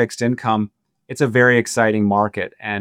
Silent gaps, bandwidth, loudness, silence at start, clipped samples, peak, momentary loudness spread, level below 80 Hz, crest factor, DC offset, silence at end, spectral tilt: none; 15 kHz; -18 LUFS; 0 s; under 0.1%; -2 dBFS; 12 LU; -64 dBFS; 18 dB; under 0.1%; 0 s; -5.5 dB/octave